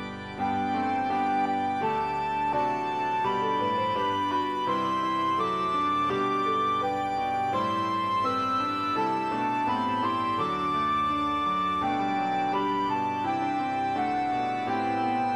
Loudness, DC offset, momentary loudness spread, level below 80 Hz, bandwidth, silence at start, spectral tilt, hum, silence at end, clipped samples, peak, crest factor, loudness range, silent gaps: -27 LUFS; under 0.1%; 2 LU; -60 dBFS; 13 kHz; 0 s; -5.5 dB/octave; none; 0 s; under 0.1%; -16 dBFS; 12 dB; 1 LU; none